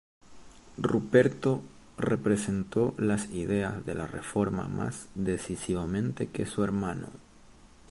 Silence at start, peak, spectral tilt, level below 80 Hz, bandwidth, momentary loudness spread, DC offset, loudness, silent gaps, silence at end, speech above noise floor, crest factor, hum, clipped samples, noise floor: 0.3 s; -8 dBFS; -6.5 dB/octave; -52 dBFS; 11.5 kHz; 11 LU; under 0.1%; -30 LUFS; none; 0.25 s; 25 dB; 22 dB; none; under 0.1%; -54 dBFS